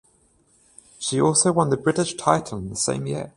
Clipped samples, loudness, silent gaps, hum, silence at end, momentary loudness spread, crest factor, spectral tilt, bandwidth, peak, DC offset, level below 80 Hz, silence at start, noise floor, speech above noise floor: under 0.1%; -22 LUFS; none; none; 0.05 s; 10 LU; 22 dB; -4.5 dB/octave; 11.5 kHz; 0 dBFS; under 0.1%; -54 dBFS; 1 s; -61 dBFS; 39 dB